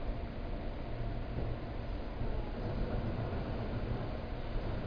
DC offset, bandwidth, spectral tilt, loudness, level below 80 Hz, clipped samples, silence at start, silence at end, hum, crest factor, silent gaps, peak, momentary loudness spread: under 0.1%; 5.2 kHz; -7 dB/octave; -40 LUFS; -40 dBFS; under 0.1%; 0 s; 0 s; none; 12 dB; none; -24 dBFS; 5 LU